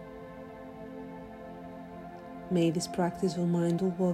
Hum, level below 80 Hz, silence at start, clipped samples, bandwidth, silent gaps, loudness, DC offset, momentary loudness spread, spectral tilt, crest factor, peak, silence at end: none; -62 dBFS; 0 s; under 0.1%; 13.5 kHz; none; -30 LUFS; under 0.1%; 17 LU; -6.5 dB/octave; 16 dB; -16 dBFS; 0 s